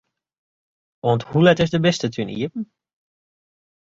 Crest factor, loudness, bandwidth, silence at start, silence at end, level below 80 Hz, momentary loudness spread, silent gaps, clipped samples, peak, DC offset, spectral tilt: 20 dB; -20 LUFS; 7.8 kHz; 1.05 s; 1.25 s; -56 dBFS; 13 LU; none; under 0.1%; -2 dBFS; under 0.1%; -6 dB/octave